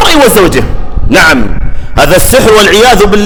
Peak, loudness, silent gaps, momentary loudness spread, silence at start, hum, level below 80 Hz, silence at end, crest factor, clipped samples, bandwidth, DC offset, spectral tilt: 0 dBFS; -4 LUFS; none; 13 LU; 0 s; none; -14 dBFS; 0 s; 4 dB; 10%; over 20 kHz; under 0.1%; -3.5 dB/octave